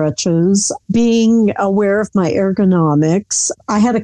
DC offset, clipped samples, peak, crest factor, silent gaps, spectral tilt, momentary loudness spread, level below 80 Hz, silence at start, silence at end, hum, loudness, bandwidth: under 0.1%; under 0.1%; -4 dBFS; 10 dB; none; -5.5 dB/octave; 4 LU; -48 dBFS; 0 s; 0 s; none; -14 LUFS; 10.5 kHz